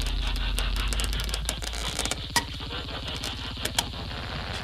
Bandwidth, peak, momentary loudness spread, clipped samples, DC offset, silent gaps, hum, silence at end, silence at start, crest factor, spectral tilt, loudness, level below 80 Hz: 16 kHz; -6 dBFS; 6 LU; under 0.1%; under 0.1%; none; none; 0 s; 0 s; 24 dB; -2.5 dB/octave; -30 LUFS; -32 dBFS